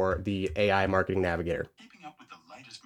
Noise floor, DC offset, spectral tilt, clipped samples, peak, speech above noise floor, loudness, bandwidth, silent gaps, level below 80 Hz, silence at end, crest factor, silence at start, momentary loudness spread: -51 dBFS; under 0.1%; -6.5 dB/octave; under 0.1%; -10 dBFS; 23 dB; -28 LUFS; 12.5 kHz; none; -50 dBFS; 0.05 s; 20 dB; 0 s; 23 LU